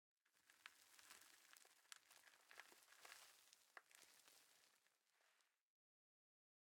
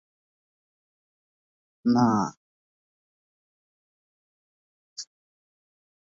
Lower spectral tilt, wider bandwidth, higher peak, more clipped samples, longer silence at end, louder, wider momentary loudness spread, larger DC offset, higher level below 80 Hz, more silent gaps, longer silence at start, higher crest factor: second, 1.5 dB/octave vs -6 dB/octave; first, 18 kHz vs 7.6 kHz; second, -34 dBFS vs -12 dBFS; neither; about the same, 1.1 s vs 1 s; second, -67 LUFS vs -24 LUFS; second, 5 LU vs 21 LU; neither; second, under -90 dBFS vs -72 dBFS; second, none vs 2.37-4.96 s; second, 0.25 s vs 1.85 s; first, 36 dB vs 20 dB